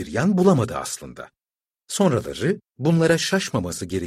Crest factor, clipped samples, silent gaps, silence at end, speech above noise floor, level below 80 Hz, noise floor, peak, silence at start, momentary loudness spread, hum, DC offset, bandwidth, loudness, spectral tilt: 18 dB; under 0.1%; none; 0 s; over 69 dB; -52 dBFS; under -90 dBFS; -4 dBFS; 0 s; 13 LU; none; under 0.1%; 15 kHz; -21 LUFS; -5.5 dB/octave